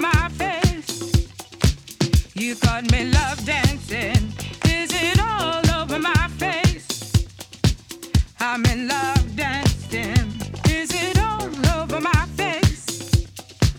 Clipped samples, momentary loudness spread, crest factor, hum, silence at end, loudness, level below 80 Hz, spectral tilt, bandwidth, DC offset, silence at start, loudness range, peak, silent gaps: under 0.1%; 5 LU; 16 dB; none; 0 s; -21 LUFS; -28 dBFS; -4.5 dB/octave; 19 kHz; under 0.1%; 0 s; 2 LU; -4 dBFS; none